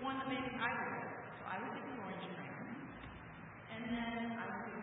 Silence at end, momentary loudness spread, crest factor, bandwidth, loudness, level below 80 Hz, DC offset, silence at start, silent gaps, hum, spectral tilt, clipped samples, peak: 0 s; 13 LU; 20 dB; 3.9 kHz; -44 LUFS; -68 dBFS; under 0.1%; 0 s; none; none; -1.5 dB/octave; under 0.1%; -24 dBFS